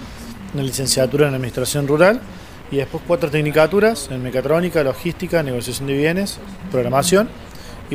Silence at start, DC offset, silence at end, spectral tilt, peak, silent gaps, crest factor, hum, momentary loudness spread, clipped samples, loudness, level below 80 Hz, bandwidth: 0 s; under 0.1%; 0 s; -5 dB/octave; 0 dBFS; none; 18 dB; none; 16 LU; under 0.1%; -18 LUFS; -42 dBFS; 16 kHz